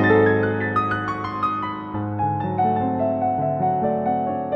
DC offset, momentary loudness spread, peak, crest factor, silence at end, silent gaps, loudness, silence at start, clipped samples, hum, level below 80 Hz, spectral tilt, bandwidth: under 0.1%; 7 LU; -6 dBFS; 16 dB; 0 s; none; -22 LUFS; 0 s; under 0.1%; none; -52 dBFS; -9 dB/octave; 6.8 kHz